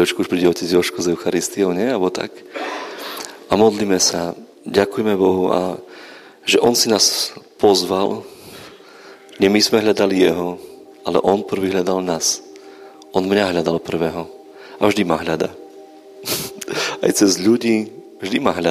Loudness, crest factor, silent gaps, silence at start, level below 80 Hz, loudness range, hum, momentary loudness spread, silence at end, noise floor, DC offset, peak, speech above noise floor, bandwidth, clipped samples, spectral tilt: -18 LUFS; 18 dB; none; 0 s; -56 dBFS; 3 LU; none; 15 LU; 0 s; -42 dBFS; under 0.1%; 0 dBFS; 25 dB; 15.5 kHz; under 0.1%; -3.5 dB/octave